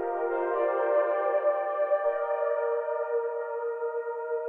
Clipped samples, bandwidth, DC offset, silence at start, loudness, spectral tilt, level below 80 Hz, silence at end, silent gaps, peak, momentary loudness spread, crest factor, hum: under 0.1%; 3.4 kHz; under 0.1%; 0 s; -28 LUFS; -5 dB/octave; -76 dBFS; 0 s; none; -16 dBFS; 7 LU; 12 dB; none